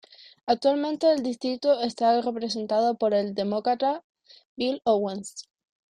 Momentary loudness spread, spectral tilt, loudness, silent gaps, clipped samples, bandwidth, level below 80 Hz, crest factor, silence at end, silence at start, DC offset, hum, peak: 9 LU; -5 dB/octave; -25 LUFS; 4.04-4.15 s, 4.45-4.57 s; under 0.1%; 10 kHz; -70 dBFS; 16 dB; 0.5 s; 0.45 s; under 0.1%; none; -10 dBFS